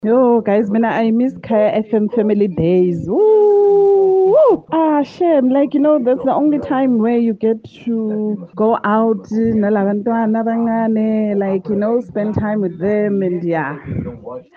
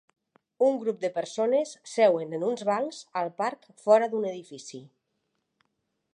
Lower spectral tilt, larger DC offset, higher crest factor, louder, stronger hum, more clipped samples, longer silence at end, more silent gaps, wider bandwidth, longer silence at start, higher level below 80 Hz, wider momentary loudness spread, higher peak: first, -9.5 dB/octave vs -4.5 dB/octave; neither; second, 12 dB vs 20 dB; first, -15 LUFS vs -27 LUFS; neither; neither; second, 0.15 s vs 1.3 s; neither; second, 6.2 kHz vs 10.5 kHz; second, 0.05 s vs 0.6 s; first, -50 dBFS vs -86 dBFS; second, 8 LU vs 15 LU; first, -4 dBFS vs -8 dBFS